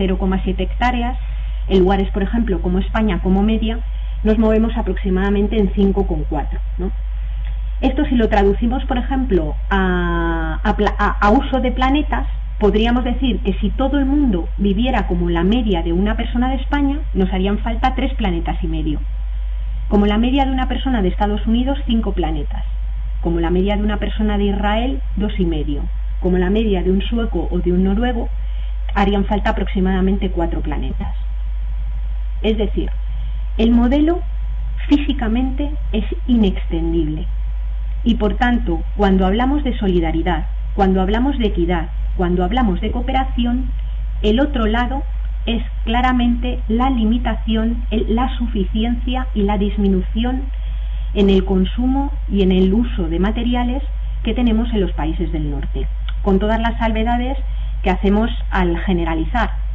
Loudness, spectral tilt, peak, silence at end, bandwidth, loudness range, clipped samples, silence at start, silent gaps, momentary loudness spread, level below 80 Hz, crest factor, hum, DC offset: -19 LUFS; -8.5 dB/octave; -4 dBFS; 0 s; 4 kHz; 2 LU; under 0.1%; 0 s; none; 9 LU; -20 dBFS; 12 dB; none; under 0.1%